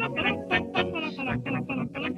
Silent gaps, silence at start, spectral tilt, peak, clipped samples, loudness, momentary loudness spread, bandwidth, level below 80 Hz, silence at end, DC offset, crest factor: none; 0 s; -6.5 dB/octave; -10 dBFS; under 0.1%; -28 LUFS; 5 LU; 11.5 kHz; -54 dBFS; 0 s; under 0.1%; 18 dB